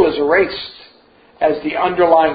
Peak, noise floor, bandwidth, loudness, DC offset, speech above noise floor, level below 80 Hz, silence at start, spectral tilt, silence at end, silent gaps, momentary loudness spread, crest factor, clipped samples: 0 dBFS; -49 dBFS; 5 kHz; -16 LUFS; under 0.1%; 34 dB; -48 dBFS; 0 s; -10 dB/octave; 0 s; none; 12 LU; 14 dB; under 0.1%